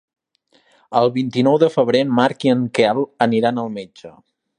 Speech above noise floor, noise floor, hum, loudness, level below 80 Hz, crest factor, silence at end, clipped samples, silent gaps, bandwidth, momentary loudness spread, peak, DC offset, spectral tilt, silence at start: 43 dB; -60 dBFS; none; -17 LUFS; -66 dBFS; 18 dB; 0.5 s; under 0.1%; none; 10 kHz; 10 LU; 0 dBFS; under 0.1%; -6.5 dB/octave; 0.9 s